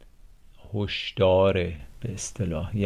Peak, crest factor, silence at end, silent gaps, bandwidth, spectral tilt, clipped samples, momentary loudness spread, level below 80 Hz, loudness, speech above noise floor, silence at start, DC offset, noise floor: -10 dBFS; 16 dB; 0 s; none; 12 kHz; -5.5 dB/octave; under 0.1%; 16 LU; -42 dBFS; -26 LUFS; 25 dB; 0.25 s; under 0.1%; -50 dBFS